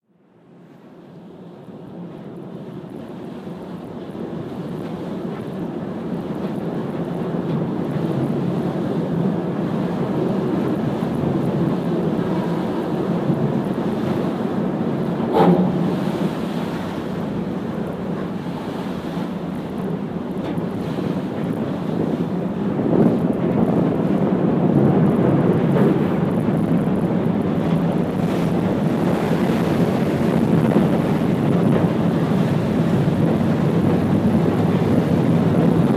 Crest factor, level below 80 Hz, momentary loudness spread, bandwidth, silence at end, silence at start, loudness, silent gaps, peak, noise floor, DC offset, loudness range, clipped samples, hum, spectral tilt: 18 dB; -48 dBFS; 12 LU; 14.5 kHz; 0 s; 0.7 s; -20 LUFS; none; -2 dBFS; -53 dBFS; under 0.1%; 11 LU; under 0.1%; none; -8.5 dB/octave